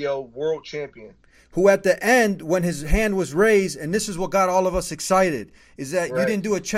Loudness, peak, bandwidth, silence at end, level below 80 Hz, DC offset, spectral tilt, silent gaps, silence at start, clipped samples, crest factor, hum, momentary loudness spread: -21 LUFS; -4 dBFS; 16 kHz; 0 s; -36 dBFS; under 0.1%; -4.5 dB/octave; none; 0 s; under 0.1%; 18 dB; none; 13 LU